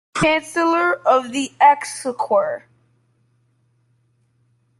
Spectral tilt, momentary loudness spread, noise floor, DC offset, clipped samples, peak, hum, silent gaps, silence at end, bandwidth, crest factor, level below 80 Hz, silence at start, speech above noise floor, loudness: -4 dB/octave; 11 LU; -63 dBFS; under 0.1%; under 0.1%; -4 dBFS; none; none; 2.2 s; 12.5 kHz; 18 dB; -58 dBFS; 0.15 s; 45 dB; -18 LUFS